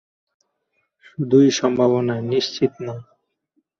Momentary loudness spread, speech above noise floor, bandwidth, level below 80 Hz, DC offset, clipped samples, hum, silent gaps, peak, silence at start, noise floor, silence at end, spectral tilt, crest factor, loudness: 17 LU; 53 dB; 7.4 kHz; -64 dBFS; under 0.1%; under 0.1%; none; none; -4 dBFS; 1.2 s; -72 dBFS; 0.75 s; -5.5 dB/octave; 18 dB; -19 LUFS